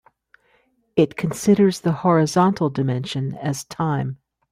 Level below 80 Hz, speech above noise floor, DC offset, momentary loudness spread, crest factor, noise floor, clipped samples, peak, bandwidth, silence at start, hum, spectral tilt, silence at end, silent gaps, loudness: -58 dBFS; 43 dB; under 0.1%; 10 LU; 18 dB; -63 dBFS; under 0.1%; -4 dBFS; 15.5 kHz; 0.95 s; none; -6.5 dB/octave; 0.35 s; none; -21 LUFS